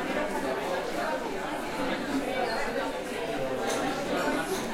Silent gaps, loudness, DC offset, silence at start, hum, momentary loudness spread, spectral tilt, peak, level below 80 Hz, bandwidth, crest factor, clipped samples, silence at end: none; -30 LUFS; under 0.1%; 0 s; none; 4 LU; -4 dB/octave; -16 dBFS; -50 dBFS; 16.5 kHz; 16 dB; under 0.1%; 0 s